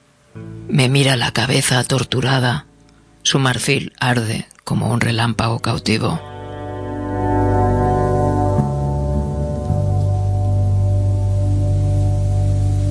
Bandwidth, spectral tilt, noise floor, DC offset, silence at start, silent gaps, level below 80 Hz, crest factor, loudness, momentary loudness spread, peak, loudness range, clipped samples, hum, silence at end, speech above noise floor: 11 kHz; -5 dB/octave; -49 dBFS; under 0.1%; 0.35 s; none; -30 dBFS; 16 dB; -18 LUFS; 9 LU; -2 dBFS; 2 LU; under 0.1%; none; 0 s; 32 dB